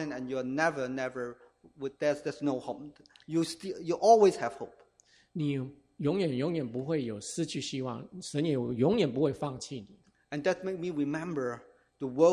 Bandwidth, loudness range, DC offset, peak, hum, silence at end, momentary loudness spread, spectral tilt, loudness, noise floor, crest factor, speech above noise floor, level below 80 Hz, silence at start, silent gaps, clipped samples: 14.5 kHz; 5 LU; under 0.1%; -10 dBFS; none; 0 s; 15 LU; -6 dB/octave; -31 LUFS; -65 dBFS; 22 dB; 35 dB; -68 dBFS; 0 s; none; under 0.1%